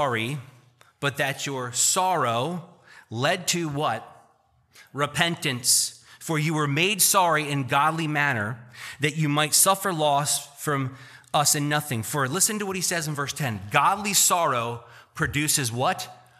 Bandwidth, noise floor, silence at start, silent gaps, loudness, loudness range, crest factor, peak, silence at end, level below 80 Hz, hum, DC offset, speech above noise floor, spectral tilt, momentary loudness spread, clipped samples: 15 kHz; -63 dBFS; 0 s; none; -23 LUFS; 4 LU; 22 dB; -4 dBFS; 0.25 s; -60 dBFS; none; under 0.1%; 38 dB; -3 dB/octave; 12 LU; under 0.1%